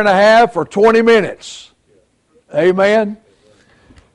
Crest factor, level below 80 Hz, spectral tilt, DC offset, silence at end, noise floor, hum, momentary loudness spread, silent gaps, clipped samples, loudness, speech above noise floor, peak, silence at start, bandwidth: 12 dB; -52 dBFS; -5 dB/octave; under 0.1%; 1 s; -56 dBFS; none; 19 LU; none; under 0.1%; -12 LUFS; 44 dB; -2 dBFS; 0 s; 11 kHz